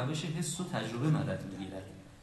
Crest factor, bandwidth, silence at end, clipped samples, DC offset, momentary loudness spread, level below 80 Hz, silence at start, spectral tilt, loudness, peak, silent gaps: 16 dB; 12.5 kHz; 0 s; under 0.1%; under 0.1%; 12 LU; -60 dBFS; 0 s; -5.5 dB/octave; -35 LUFS; -20 dBFS; none